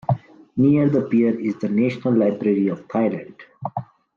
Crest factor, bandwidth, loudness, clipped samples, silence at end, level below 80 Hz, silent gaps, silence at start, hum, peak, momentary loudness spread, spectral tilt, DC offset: 14 dB; 6.8 kHz; -21 LUFS; under 0.1%; 0.3 s; -60 dBFS; none; 0.1 s; none; -6 dBFS; 13 LU; -10 dB/octave; under 0.1%